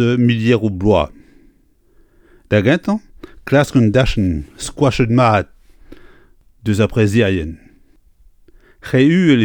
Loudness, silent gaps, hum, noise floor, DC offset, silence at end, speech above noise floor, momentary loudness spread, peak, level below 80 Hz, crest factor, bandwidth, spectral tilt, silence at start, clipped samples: -15 LUFS; none; none; -53 dBFS; under 0.1%; 0 s; 40 dB; 12 LU; 0 dBFS; -34 dBFS; 16 dB; 17 kHz; -7 dB/octave; 0 s; under 0.1%